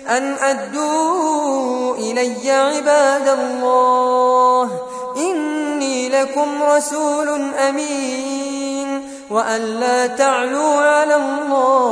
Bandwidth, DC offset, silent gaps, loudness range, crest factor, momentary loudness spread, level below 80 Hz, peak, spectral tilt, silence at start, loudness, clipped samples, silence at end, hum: 11 kHz; under 0.1%; none; 4 LU; 14 dB; 8 LU; -66 dBFS; -2 dBFS; -2.5 dB/octave; 0 s; -17 LUFS; under 0.1%; 0 s; none